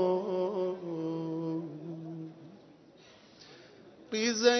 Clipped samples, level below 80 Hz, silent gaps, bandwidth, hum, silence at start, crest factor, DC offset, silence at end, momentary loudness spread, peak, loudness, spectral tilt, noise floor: under 0.1%; -80 dBFS; none; 6.4 kHz; none; 0 s; 22 dB; under 0.1%; 0 s; 24 LU; -12 dBFS; -34 LUFS; -4 dB/octave; -57 dBFS